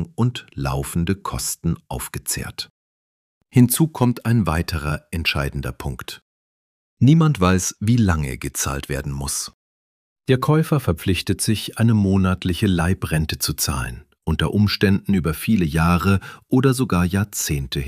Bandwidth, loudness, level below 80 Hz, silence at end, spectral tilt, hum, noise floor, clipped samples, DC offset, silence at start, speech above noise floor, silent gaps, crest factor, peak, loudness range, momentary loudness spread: 15.5 kHz; -20 LUFS; -36 dBFS; 0 s; -5.5 dB/octave; none; under -90 dBFS; under 0.1%; under 0.1%; 0 s; over 70 dB; 2.70-3.41 s, 6.22-6.97 s, 9.54-10.16 s; 18 dB; -2 dBFS; 3 LU; 11 LU